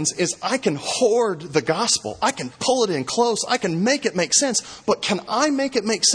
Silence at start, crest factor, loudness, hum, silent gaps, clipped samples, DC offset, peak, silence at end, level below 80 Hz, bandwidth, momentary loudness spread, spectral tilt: 0 s; 16 dB; -21 LUFS; none; none; under 0.1%; under 0.1%; -4 dBFS; 0 s; -62 dBFS; 10.5 kHz; 5 LU; -2.5 dB/octave